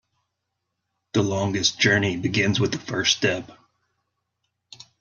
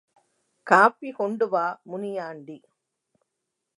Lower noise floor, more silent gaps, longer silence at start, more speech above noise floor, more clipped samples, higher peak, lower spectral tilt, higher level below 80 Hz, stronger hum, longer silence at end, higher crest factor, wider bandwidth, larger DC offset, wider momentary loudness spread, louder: about the same, -80 dBFS vs -82 dBFS; neither; first, 1.15 s vs 0.65 s; about the same, 57 dB vs 58 dB; neither; about the same, -4 dBFS vs -2 dBFS; second, -4 dB/octave vs -5.5 dB/octave; first, -60 dBFS vs -84 dBFS; neither; first, 1.5 s vs 1.2 s; about the same, 22 dB vs 24 dB; second, 7.4 kHz vs 11.5 kHz; neither; second, 6 LU vs 23 LU; about the same, -22 LUFS vs -23 LUFS